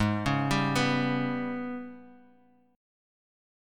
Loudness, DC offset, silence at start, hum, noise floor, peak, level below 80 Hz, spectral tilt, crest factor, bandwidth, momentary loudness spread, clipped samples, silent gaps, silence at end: -28 LUFS; under 0.1%; 0 s; none; -62 dBFS; -12 dBFS; -52 dBFS; -5.5 dB/octave; 18 dB; 16.5 kHz; 12 LU; under 0.1%; none; 1.6 s